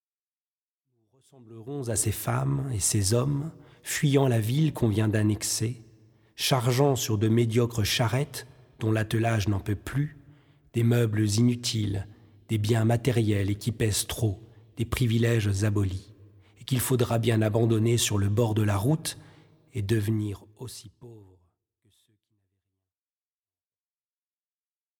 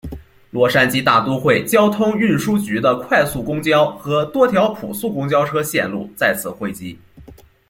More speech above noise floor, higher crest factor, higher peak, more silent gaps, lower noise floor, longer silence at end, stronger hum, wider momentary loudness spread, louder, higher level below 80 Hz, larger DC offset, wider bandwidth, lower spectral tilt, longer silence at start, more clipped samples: first, over 65 dB vs 26 dB; about the same, 18 dB vs 16 dB; second, -8 dBFS vs -2 dBFS; neither; first, under -90 dBFS vs -43 dBFS; first, 3.8 s vs 0.35 s; neither; about the same, 12 LU vs 11 LU; second, -26 LUFS vs -17 LUFS; second, -52 dBFS vs -46 dBFS; neither; about the same, 18.5 kHz vs 17 kHz; about the same, -5.5 dB/octave vs -5 dB/octave; first, 1.5 s vs 0.05 s; neither